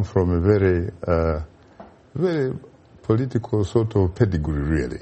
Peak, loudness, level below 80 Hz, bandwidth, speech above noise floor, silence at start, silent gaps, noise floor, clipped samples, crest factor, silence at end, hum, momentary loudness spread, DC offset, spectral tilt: -4 dBFS; -22 LUFS; -36 dBFS; 8.4 kHz; 26 dB; 0 s; none; -46 dBFS; under 0.1%; 16 dB; 0 s; none; 11 LU; under 0.1%; -9 dB/octave